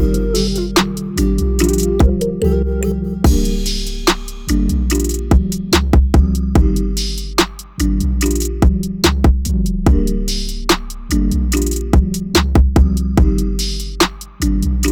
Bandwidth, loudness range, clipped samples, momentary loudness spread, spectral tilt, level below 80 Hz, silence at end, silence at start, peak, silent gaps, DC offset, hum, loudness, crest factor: 18.5 kHz; 1 LU; under 0.1%; 6 LU; -5.5 dB/octave; -16 dBFS; 0 s; 0 s; -2 dBFS; none; under 0.1%; none; -16 LUFS; 14 dB